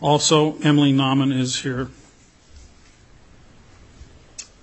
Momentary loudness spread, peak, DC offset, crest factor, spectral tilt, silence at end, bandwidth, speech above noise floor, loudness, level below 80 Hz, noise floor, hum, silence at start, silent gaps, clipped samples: 22 LU; -4 dBFS; under 0.1%; 18 dB; -5 dB/octave; 0.2 s; 8.4 kHz; 33 dB; -18 LUFS; -52 dBFS; -51 dBFS; none; 0 s; none; under 0.1%